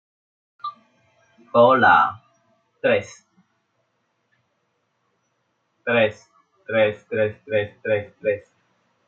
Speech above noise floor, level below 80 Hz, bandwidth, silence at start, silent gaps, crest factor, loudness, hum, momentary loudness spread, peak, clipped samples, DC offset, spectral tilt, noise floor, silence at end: 52 dB; -72 dBFS; 7.4 kHz; 0.65 s; none; 22 dB; -20 LUFS; none; 19 LU; -2 dBFS; under 0.1%; under 0.1%; -6 dB/octave; -71 dBFS; 0.65 s